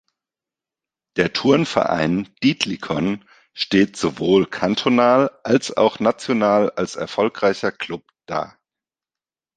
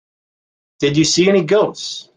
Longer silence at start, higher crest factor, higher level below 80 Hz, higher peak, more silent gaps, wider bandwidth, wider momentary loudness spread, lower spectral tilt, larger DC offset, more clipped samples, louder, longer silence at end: first, 1.15 s vs 0.8 s; first, 20 dB vs 14 dB; about the same, -56 dBFS vs -54 dBFS; about the same, 0 dBFS vs -2 dBFS; neither; about the same, 9.6 kHz vs 9.8 kHz; first, 11 LU vs 8 LU; first, -5.5 dB/octave vs -4 dB/octave; neither; neither; second, -19 LUFS vs -15 LUFS; first, 1.1 s vs 0.15 s